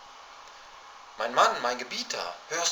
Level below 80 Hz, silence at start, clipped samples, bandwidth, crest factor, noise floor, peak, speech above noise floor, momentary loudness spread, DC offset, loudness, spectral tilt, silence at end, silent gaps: -72 dBFS; 0 s; under 0.1%; over 20 kHz; 24 dB; -48 dBFS; -8 dBFS; 20 dB; 24 LU; under 0.1%; -28 LUFS; 0 dB/octave; 0 s; none